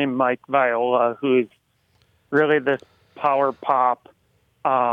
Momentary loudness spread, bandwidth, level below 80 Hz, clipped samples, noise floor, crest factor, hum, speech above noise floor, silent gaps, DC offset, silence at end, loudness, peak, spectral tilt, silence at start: 7 LU; 5.2 kHz; -74 dBFS; under 0.1%; -64 dBFS; 16 dB; none; 44 dB; none; under 0.1%; 0 s; -21 LUFS; -6 dBFS; -7.5 dB/octave; 0 s